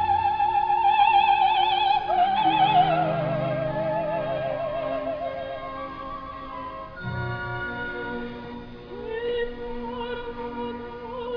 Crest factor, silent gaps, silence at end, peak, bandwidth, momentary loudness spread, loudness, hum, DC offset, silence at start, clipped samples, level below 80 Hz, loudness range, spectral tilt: 16 dB; none; 0 s; -8 dBFS; 5.4 kHz; 16 LU; -25 LUFS; none; under 0.1%; 0 s; under 0.1%; -48 dBFS; 12 LU; -7.5 dB/octave